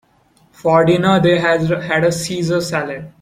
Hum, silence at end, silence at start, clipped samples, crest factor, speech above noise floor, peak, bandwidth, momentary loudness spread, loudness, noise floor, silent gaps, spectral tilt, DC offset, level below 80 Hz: none; 0.1 s; 0.65 s; under 0.1%; 16 dB; 39 dB; 0 dBFS; 15.5 kHz; 9 LU; -15 LUFS; -55 dBFS; none; -5.5 dB/octave; under 0.1%; -50 dBFS